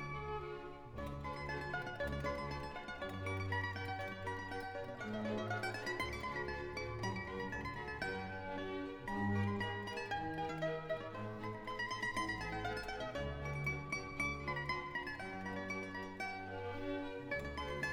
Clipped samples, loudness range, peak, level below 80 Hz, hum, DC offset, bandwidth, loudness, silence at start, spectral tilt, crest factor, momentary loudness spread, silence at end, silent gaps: under 0.1%; 2 LU; -26 dBFS; -56 dBFS; none; under 0.1%; 18 kHz; -42 LUFS; 0 s; -5.5 dB/octave; 16 dB; 6 LU; 0 s; none